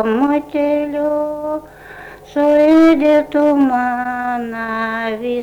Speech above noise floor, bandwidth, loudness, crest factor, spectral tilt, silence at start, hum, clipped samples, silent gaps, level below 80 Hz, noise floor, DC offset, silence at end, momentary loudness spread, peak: 21 dB; 10 kHz; -15 LUFS; 10 dB; -6 dB/octave; 0 s; none; under 0.1%; none; -50 dBFS; -36 dBFS; under 0.1%; 0 s; 14 LU; -4 dBFS